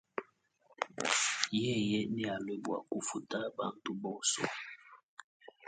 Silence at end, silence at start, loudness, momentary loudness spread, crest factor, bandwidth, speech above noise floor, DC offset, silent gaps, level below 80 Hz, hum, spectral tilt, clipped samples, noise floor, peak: 0 s; 0.15 s; -35 LUFS; 18 LU; 28 dB; 9.4 kHz; 34 dB; under 0.1%; 5.03-5.17 s, 5.24-5.40 s; -76 dBFS; none; -3 dB/octave; under 0.1%; -70 dBFS; -10 dBFS